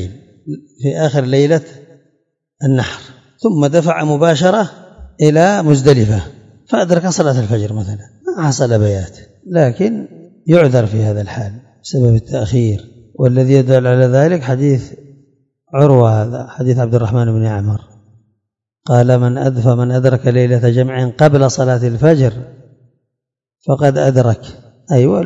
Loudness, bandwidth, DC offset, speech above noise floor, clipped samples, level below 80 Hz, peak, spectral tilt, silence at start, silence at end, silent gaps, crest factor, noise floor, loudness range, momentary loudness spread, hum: -13 LUFS; 7.8 kHz; under 0.1%; 65 dB; 0.3%; -46 dBFS; 0 dBFS; -7 dB/octave; 0 s; 0 s; none; 14 dB; -77 dBFS; 3 LU; 14 LU; none